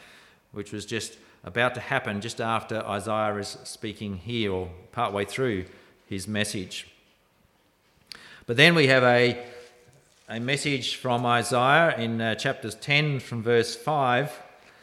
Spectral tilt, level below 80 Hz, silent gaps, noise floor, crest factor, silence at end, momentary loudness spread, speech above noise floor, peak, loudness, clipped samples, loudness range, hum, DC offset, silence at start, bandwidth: -4.5 dB/octave; -64 dBFS; none; -65 dBFS; 24 dB; 0.35 s; 19 LU; 39 dB; -2 dBFS; -25 LUFS; under 0.1%; 8 LU; none; under 0.1%; 0.55 s; 15 kHz